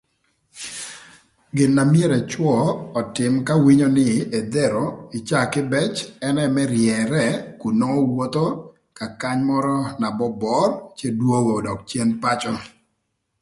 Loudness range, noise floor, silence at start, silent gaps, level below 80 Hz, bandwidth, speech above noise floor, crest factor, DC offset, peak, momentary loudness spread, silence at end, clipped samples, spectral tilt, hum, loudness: 4 LU; -73 dBFS; 0.55 s; none; -56 dBFS; 11.5 kHz; 54 dB; 16 dB; under 0.1%; -4 dBFS; 12 LU; 0.75 s; under 0.1%; -6 dB/octave; none; -20 LUFS